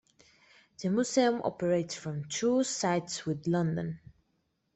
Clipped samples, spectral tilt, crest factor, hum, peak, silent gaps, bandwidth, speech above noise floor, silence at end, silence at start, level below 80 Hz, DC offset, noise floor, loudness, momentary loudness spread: under 0.1%; -5 dB/octave; 18 dB; none; -12 dBFS; none; 8.4 kHz; 47 dB; 0.75 s; 0.8 s; -68 dBFS; under 0.1%; -77 dBFS; -31 LUFS; 10 LU